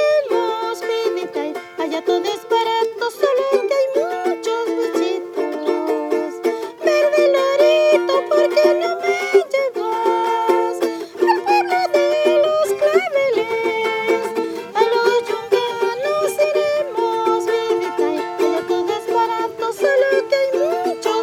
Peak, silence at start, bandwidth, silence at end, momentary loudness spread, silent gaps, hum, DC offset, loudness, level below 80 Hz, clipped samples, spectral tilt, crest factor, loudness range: 0 dBFS; 0 s; 18 kHz; 0 s; 7 LU; none; none; under 0.1%; -18 LUFS; -70 dBFS; under 0.1%; -3 dB/octave; 16 dB; 4 LU